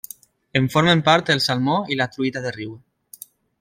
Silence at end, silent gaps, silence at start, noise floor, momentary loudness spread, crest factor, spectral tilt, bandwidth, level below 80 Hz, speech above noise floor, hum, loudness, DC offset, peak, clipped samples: 0.85 s; none; 0.55 s; -45 dBFS; 24 LU; 20 dB; -5 dB/octave; 16.5 kHz; -58 dBFS; 25 dB; none; -19 LUFS; under 0.1%; -2 dBFS; under 0.1%